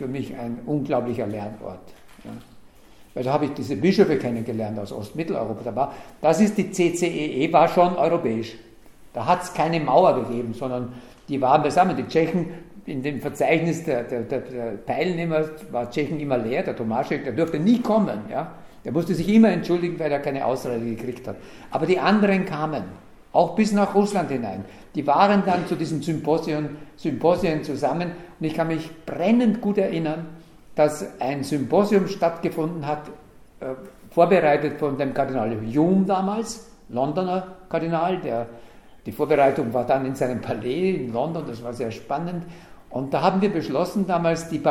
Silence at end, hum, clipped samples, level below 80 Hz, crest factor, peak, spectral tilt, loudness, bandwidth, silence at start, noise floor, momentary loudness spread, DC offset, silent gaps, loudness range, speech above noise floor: 0 s; none; under 0.1%; -54 dBFS; 20 dB; -2 dBFS; -6.5 dB/octave; -23 LUFS; 14.5 kHz; 0 s; -48 dBFS; 14 LU; under 0.1%; none; 4 LU; 26 dB